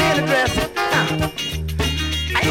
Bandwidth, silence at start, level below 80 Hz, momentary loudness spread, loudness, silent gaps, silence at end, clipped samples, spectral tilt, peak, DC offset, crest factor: 17 kHz; 0 s; -30 dBFS; 6 LU; -20 LUFS; none; 0 s; under 0.1%; -4 dB/octave; -6 dBFS; under 0.1%; 14 dB